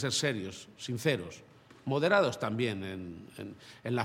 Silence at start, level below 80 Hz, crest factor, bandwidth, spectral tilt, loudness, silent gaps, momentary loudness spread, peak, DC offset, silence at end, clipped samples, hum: 0 s; -70 dBFS; 22 dB; 16.5 kHz; -4.5 dB/octave; -32 LUFS; none; 18 LU; -12 dBFS; under 0.1%; 0 s; under 0.1%; none